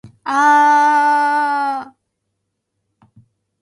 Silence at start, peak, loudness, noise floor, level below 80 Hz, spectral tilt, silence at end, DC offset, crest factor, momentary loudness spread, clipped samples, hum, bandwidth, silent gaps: 0.05 s; -4 dBFS; -14 LUFS; -74 dBFS; -68 dBFS; -2.5 dB/octave; 1.75 s; under 0.1%; 14 dB; 10 LU; under 0.1%; none; 11.5 kHz; none